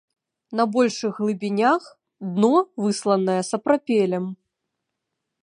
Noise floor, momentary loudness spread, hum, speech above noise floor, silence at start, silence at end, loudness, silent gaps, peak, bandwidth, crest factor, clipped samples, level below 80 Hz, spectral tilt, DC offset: -81 dBFS; 9 LU; none; 60 dB; 0.5 s; 1.1 s; -22 LUFS; none; -4 dBFS; 11 kHz; 18 dB; under 0.1%; -74 dBFS; -5.5 dB/octave; under 0.1%